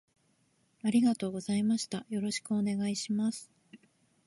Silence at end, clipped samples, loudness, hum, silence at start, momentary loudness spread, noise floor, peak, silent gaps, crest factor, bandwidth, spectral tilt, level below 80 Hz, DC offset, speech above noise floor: 0.5 s; under 0.1%; -32 LUFS; none; 0.85 s; 8 LU; -72 dBFS; -16 dBFS; none; 16 dB; 11.5 kHz; -5 dB/octave; -76 dBFS; under 0.1%; 41 dB